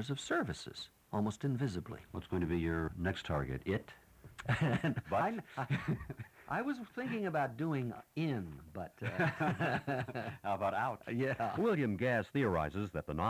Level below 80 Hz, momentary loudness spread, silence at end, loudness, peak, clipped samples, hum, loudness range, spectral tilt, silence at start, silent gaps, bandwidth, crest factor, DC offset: -56 dBFS; 11 LU; 0 s; -37 LUFS; -20 dBFS; under 0.1%; none; 3 LU; -7 dB/octave; 0 s; none; 16 kHz; 16 dB; under 0.1%